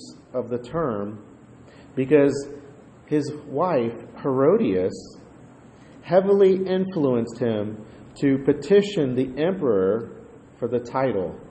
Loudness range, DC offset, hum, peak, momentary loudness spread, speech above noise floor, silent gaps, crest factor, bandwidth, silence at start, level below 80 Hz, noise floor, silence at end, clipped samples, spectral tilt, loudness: 3 LU; under 0.1%; none; -4 dBFS; 15 LU; 25 dB; none; 18 dB; 8.8 kHz; 0 s; -58 dBFS; -47 dBFS; 0 s; under 0.1%; -7.5 dB/octave; -23 LUFS